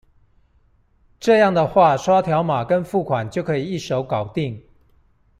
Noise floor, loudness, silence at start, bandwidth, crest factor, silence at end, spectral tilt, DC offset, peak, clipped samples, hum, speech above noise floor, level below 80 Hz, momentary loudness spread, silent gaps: -58 dBFS; -19 LUFS; 1.2 s; 14 kHz; 18 dB; 0.8 s; -6.5 dB/octave; under 0.1%; -2 dBFS; under 0.1%; none; 40 dB; -52 dBFS; 10 LU; none